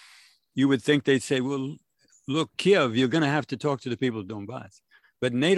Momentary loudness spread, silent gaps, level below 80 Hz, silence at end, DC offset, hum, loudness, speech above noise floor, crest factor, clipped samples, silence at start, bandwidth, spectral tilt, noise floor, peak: 15 LU; none; -66 dBFS; 0 s; under 0.1%; none; -25 LUFS; 32 dB; 18 dB; under 0.1%; 0.55 s; 12 kHz; -5.5 dB/octave; -56 dBFS; -8 dBFS